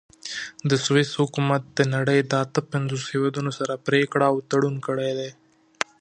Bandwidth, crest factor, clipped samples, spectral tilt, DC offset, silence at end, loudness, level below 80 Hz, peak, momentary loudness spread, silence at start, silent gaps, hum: 10 kHz; 24 dB; under 0.1%; -5.5 dB/octave; under 0.1%; 0.7 s; -24 LUFS; -68 dBFS; 0 dBFS; 11 LU; 0.25 s; none; none